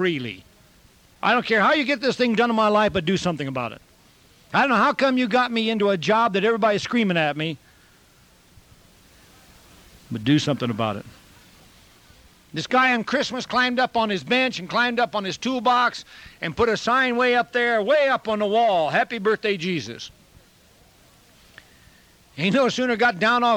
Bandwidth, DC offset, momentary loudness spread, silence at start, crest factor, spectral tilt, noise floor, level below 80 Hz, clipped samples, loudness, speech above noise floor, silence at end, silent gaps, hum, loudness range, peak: 16.5 kHz; under 0.1%; 11 LU; 0 s; 16 dB; -5 dB/octave; -55 dBFS; -58 dBFS; under 0.1%; -21 LUFS; 34 dB; 0 s; none; none; 7 LU; -6 dBFS